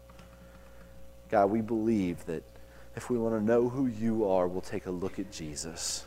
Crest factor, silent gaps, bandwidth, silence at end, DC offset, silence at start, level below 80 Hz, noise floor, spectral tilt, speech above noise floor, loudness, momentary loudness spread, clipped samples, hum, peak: 18 dB; none; 16 kHz; 0 s; under 0.1%; 0 s; -56 dBFS; -52 dBFS; -5.5 dB/octave; 22 dB; -31 LUFS; 12 LU; under 0.1%; 60 Hz at -50 dBFS; -12 dBFS